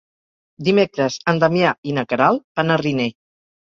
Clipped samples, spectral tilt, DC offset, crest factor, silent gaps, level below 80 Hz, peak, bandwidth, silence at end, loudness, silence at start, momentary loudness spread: under 0.1%; -6 dB/octave; under 0.1%; 18 dB; 1.78-1.83 s, 2.44-2.55 s; -60 dBFS; -2 dBFS; 7.6 kHz; 0.6 s; -19 LUFS; 0.6 s; 7 LU